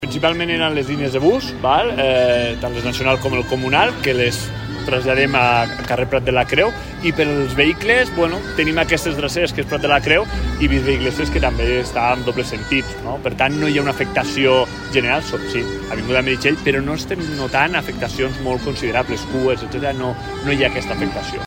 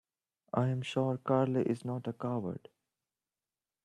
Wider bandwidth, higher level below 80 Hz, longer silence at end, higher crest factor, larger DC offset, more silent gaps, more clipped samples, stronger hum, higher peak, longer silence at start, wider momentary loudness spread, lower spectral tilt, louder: first, 16.5 kHz vs 10.5 kHz; first, -32 dBFS vs -74 dBFS; second, 0 s vs 1.25 s; about the same, 18 dB vs 18 dB; neither; neither; neither; neither; first, 0 dBFS vs -16 dBFS; second, 0 s vs 0.55 s; about the same, 7 LU vs 8 LU; second, -5 dB/octave vs -8 dB/octave; first, -18 LUFS vs -34 LUFS